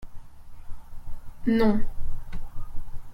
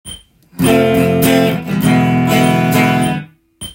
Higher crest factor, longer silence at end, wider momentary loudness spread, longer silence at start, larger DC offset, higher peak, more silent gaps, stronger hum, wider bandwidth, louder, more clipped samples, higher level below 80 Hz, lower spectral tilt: about the same, 16 dB vs 14 dB; about the same, 0 s vs 0 s; first, 25 LU vs 7 LU; about the same, 0 s vs 0.05 s; neither; second, -8 dBFS vs 0 dBFS; neither; neither; second, 5.2 kHz vs 17 kHz; second, -26 LUFS vs -12 LUFS; neither; first, -34 dBFS vs -44 dBFS; first, -8 dB/octave vs -6 dB/octave